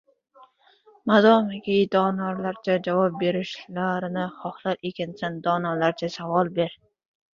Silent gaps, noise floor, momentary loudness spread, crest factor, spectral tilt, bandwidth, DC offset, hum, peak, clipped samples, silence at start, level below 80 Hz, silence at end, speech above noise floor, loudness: none; -58 dBFS; 12 LU; 20 dB; -7 dB/octave; 7.2 kHz; under 0.1%; none; -4 dBFS; under 0.1%; 0.4 s; -68 dBFS; 0.6 s; 34 dB; -24 LUFS